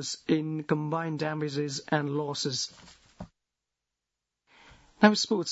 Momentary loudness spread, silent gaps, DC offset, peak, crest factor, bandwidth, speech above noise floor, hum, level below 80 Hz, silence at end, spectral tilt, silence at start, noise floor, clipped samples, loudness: 19 LU; none; under 0.1%; -4 dBFS; 26 dB; 8 kHz; 59 dB; 60 Hz at -65 dBFS; -68 dBFS; 0 s; -4.5 dB/octave; 0 s; -87 dBFS; under 0.1%; -28 LUFS